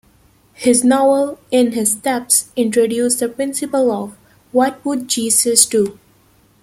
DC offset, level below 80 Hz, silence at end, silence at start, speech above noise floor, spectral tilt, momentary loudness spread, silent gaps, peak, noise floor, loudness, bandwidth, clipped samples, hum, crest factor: under 0.1%; -58 dBFS; 0.7 s; 0.6 s; 37 dB; -2.5 dB/octave; 9 LU; none; 0 dBFS; -53 dBFS; -15 LUFS; 16.5 kHz; under 0.1%; none; 16 dB